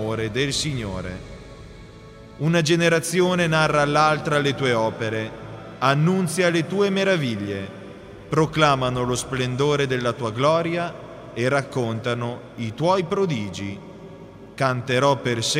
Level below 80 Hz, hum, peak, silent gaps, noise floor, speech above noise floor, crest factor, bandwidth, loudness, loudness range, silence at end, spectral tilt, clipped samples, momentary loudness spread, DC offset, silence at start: -50 dBFS; none; -2 dBFS; none; -43 dBFS; 21 dB; 20 dB; 15.5 kHz; -22 LUFS; 5 LU; 0 s; -5 dB/octave; under 0.1%; 19 LU; under 0.1%; 0 s